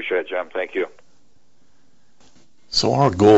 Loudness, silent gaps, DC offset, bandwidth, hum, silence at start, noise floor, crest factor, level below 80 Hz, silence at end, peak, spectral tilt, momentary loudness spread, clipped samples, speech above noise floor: -21 LUFS; none; 0.6%; 8.2 kHz; none; 0 s; -63 dBFS; 18 dB; -52 dBFS; 0 s; -2 dBFS; -5.5 dB/octave; 11 LU; under 0.1%; 45 dB